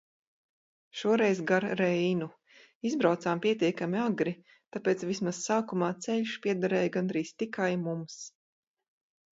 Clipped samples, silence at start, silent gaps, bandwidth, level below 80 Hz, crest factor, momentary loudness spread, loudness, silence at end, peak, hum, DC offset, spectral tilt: under 0.1%; 0.95 s; 2.75-2.81 s; 8 kHz; -76 dBFS; 20 dB; 11 LU; -30 LUFS; 1.05 s; -12 dBFS; none; under 0.1%; -5.5 dB/octave